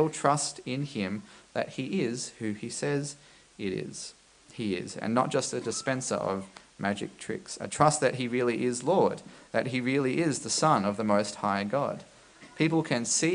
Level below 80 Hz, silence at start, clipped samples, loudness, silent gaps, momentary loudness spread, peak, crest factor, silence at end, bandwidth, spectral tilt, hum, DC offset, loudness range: -68 dBFS; 0 s; under 0.1%; -29 LUFS; none; 12 LU; -6 dBFS; 24 dB; 0 s; 10.5 kHz; -4.5 dB/octave; none; under 0.1%; 6 LU